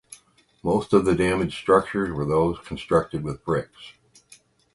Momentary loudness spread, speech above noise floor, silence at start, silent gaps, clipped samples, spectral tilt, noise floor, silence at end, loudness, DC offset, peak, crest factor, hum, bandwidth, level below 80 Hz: 10 LU; 35 dB; 0.1 s; none; under 0.1%; -6.5 dB/octave; -58 dBFS; 0.85 s; -23 LUFS; under 0.1%; -4 dBFS; 20 dB; none; 11.5 kHz; -46 dBFS